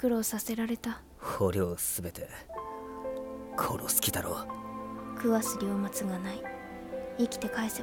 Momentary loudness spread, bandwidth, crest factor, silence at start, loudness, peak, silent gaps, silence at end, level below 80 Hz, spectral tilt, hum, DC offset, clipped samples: 12 LU; 17.5 kHz; 22 dB; 0 s; -33 LUFS; -10 dBFS; none; 0 s; -56 dBFS; -4 dB/octave; none; under 0.1%; under 0.1%